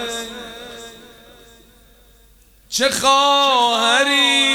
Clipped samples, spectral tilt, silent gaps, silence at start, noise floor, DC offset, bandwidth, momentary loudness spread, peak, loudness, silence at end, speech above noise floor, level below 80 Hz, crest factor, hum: under 0.1%; -0.5 dB/octave; none; 0 s; -50 dBFS; under 0.1%; over 20 kHz; 21 LU; -2 dBFS; -15 LUFS; 0 s; 35 dB; -54 dBFS; 18 dB; none